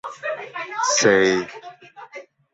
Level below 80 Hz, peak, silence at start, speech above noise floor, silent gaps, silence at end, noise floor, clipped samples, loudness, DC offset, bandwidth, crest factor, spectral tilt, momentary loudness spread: -62 dBFS; -4 dBFS; 0.05 s; 22 dB; none; 0.3 s; -42 dBFS; under 0.1%; -20 LUFS; under 0.1%; 8.2 kHz; 18 dB; -2.5 dB/octave; 24 LU